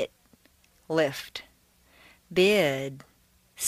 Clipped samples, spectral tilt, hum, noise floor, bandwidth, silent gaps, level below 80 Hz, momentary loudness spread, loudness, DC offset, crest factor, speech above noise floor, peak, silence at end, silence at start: under 0.1%; -4 dB/octave; none; -63 dBFS; 15.5 kHz; none; -64 dBFS; 19 LU; -26 LUFS; under 0.1%; 20 dB; 37 dB; -10 dBFS; 0 s; 0 s